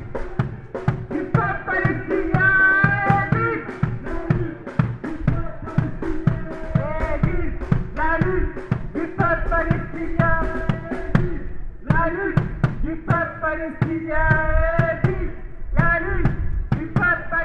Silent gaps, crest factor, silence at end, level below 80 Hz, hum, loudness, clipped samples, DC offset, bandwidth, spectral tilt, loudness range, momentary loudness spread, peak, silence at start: none; 20 dB; 0 s; -28 dBFS; none; -22 LUFS; under 0.1%; under 0.1%; 6.6 kHz; -9 dB/octave; 5 LU; 9 LU; 0 dBFS; 0 s